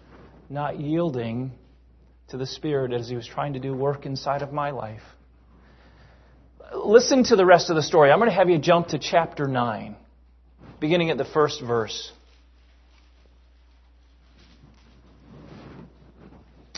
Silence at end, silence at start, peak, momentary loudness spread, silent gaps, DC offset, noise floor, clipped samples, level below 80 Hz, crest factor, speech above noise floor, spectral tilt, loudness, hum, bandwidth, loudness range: 0.5 s; 0.5 s; -2 dBFS; 20 LU; none; under 0.1%; -55 dBFS; under 0.1%; -54 dBFS; 24 dB; 33 dB; -5.5 dB/octave; -22 LUFS; none; 6.4 kHz; 12 LU